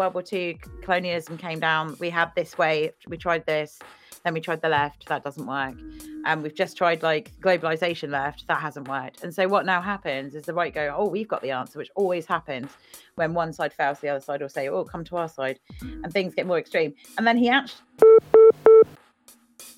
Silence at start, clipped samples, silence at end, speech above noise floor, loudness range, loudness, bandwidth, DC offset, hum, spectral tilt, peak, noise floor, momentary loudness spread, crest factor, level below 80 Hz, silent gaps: 0 s; under 0.1%; 0.05 s; 30 dB; 10 LU; -23 LUFS; 14.5 kHz; under 0.1%; none; -5.5 dB/octave; -2 dBFS; -56 dBFS; 15 LU; 22 dB; -56 dBFS; none